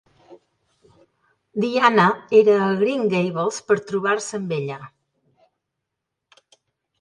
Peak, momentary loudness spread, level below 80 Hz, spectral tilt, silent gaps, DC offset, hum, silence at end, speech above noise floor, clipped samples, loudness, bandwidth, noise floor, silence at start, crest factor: 0 dBFS; 12 LU; -70 dBFS; -5.5 dB/octave; none; under 0.1%; none; 2.1 s; 62 dB; under 0.1%; -20 LUFS; 10.5 kHz; -81 dBFS; 0.3 s; 22 dB